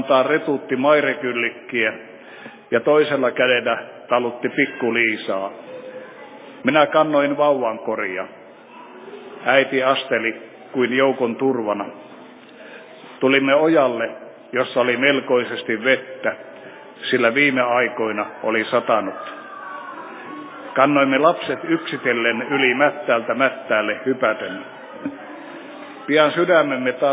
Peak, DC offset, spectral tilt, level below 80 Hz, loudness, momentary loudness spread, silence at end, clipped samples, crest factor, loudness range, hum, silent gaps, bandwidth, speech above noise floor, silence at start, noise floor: 0 dBFS; under 0.1%; -8.5 dB/octave; -74 dBFS; -19 LUFS; 20 LU; 0 s; under 0.1%; 20 dB; 3 LU; none; none; 4 kHz; 23 dB; 0 s; -42 dBFS